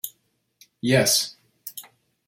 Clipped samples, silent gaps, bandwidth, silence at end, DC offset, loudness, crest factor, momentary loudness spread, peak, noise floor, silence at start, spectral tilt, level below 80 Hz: under 0.1%; none; 16.5 kHz; 0.45 s; under 0.1%; -21 LUFS; 22 dB; 22 LU; -6 dBFS; -69 dBFS; 0.05 s; -3 dB/octave; -64 dBFS